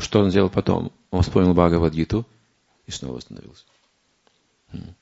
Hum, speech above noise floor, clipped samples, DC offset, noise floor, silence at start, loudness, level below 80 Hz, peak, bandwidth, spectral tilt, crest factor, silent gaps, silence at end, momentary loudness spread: none; 45 dB; under 0.1%; under 0.1%; -65 dBFS; 0 s; -21 LUFS; -40 dBFS; 0 dBFS; 8 kHz; -7 dB/octave; 22 dB; none; 0.1 s; 23 LU